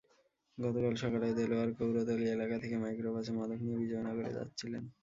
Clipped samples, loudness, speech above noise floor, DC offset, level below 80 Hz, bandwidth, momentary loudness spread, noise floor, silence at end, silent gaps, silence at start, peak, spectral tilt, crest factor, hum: under 0.1%; -36 LUFS; 37 dB; under 0.1%; -66 dBFS; 7.6 kHz; 8 LU; -73 dBFS; 0.1 s; none; 0.55 s; -20 dBFS; -6.5 dB/octave; 16 dB; none